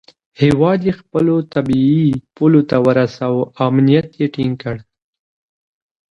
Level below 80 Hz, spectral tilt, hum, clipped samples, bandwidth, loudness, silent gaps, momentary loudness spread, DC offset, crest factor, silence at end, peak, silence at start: -48 dBFS; -9 dB/octave; none; under 0.1%; 10.5 kHz; -15 LUFS; none; 8 LU; under 0.1%; 16 dB; 1.3 s; 0 dBFS; 0.4 s